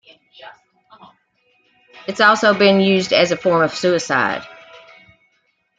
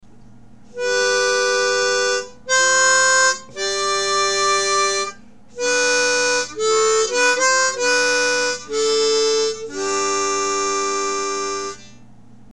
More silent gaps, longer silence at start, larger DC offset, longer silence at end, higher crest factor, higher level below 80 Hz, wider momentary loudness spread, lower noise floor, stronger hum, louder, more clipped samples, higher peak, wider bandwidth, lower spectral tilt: neither; second, 0.4 s vs 0.75 s; second, under 0.1% vs 0.7%; first, 1.25 s vs 0.65 s; about the same, 18 dB vs 14 dB; second, -62 dBFS vs -56 dBFS; first, 16 LU vs 9 LU; first, -65 dBFS vs -47 dBFS; neither; about the same, -15 LUFS vs -17 LUFS; neither; about the same, -2 dBFS vs -4 dBFS; second, 9.2 kHz vs 13.5 kHz; first, -4.5 dB/octave vs 0.5 dB/octave